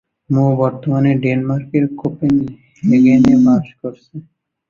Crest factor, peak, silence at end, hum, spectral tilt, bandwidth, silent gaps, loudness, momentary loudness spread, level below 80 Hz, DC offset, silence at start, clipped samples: 14 dB; -2 dBFS; 0.5 s; none; -9 dB/octave; 7 kHz; none; -14 LUFS; 19 LU; -50 dBFS; under 0.1%; 0.3 s; under 0.1%